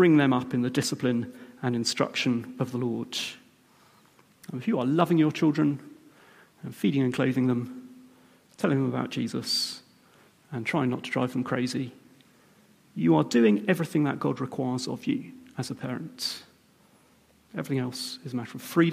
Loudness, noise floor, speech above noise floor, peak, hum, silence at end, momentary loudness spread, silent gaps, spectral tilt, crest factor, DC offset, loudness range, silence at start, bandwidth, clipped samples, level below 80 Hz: -27 LUFS; -61 dBFS; 35 dB; -8 dBFS; none; 0 s; 15 LU; none; -5.5 dB/octave; 20 dB; under 0.1%; 6 LU; 0 s; 15.5 kHz; under 0.1%; -72 dBFS